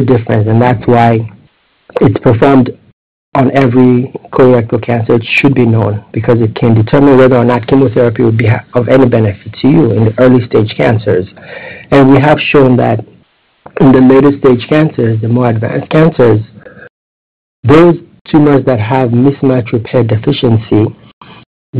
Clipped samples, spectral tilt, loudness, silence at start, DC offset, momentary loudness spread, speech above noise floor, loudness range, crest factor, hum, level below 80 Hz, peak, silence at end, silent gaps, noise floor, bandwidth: 0.2%; -9.5 dB/octave; -9 LUFS; 0 s; 0.9%; 9 LU; 41 dB; 2 LU; 8 dB; none; -38 dBFS; 0 dBFS; 0 s; 2.93-3.32 s, 16.90-17.63 s, 18.21-18.25 s, 21.13-21.21 s, 21.46-21.73 s; -49 dBFS; 5.6 kHz